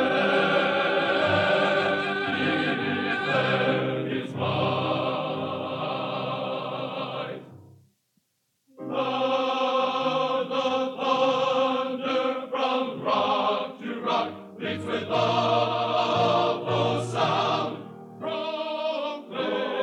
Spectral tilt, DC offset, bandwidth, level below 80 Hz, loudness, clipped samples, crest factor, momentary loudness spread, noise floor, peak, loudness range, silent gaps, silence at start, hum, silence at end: -5.5 dB/octave; under 0.1%; 10.5 kHz; -76 dBFS; -26 LUFS; under 0.1%; 16 dB; 9 LU; -74 dBFS; -10 dBFS; 7 LU; none; 0 s; none; 0 s